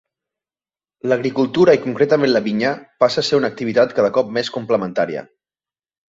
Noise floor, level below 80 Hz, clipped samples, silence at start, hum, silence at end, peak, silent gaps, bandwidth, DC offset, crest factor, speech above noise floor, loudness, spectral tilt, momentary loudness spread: under -90 dBFS; -60 dBFS; under 0.1%; 1.05 s; none; 0.85 s; -2 dBFS; none; 8 kHz; under 0.1%; 16 dB; over 73 dB; -17 LUFS; -5.5 dB/octave; 8 LU